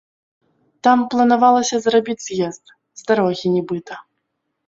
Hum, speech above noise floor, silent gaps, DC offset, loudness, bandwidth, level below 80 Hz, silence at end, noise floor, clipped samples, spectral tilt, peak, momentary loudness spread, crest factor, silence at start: none; 57 dB; none; under 0.1%; -17 LUFS; 7.8 kHz; -64 dBFS; 0.65 s; -74 dBFS; under 0.1%; -4.5 dB/octave; -2 dBFS; 14 LU; 16 dB; 0.85 s